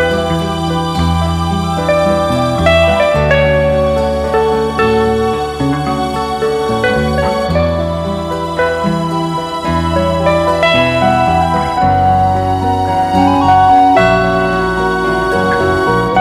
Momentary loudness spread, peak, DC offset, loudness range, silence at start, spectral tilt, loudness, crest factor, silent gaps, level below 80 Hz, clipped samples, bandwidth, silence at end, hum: 6 LU; 0 dBFS; under 0.1%; 4 LU; 0 s; -6 dB/octave; -12 LUFS; 12 dB; none; -28 dBFS; under 0.1%; 15 kHz; 0 s; none